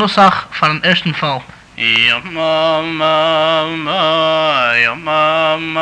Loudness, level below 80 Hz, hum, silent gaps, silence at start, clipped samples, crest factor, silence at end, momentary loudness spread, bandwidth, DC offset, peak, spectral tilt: -13 LUFS; -50 dBFS; none; none; 0 s; under 0.1%; 12 dB; 0 s; 6 LU; 9.8 kHz; under 0.1%; -2 dBFS; -5 dB/octave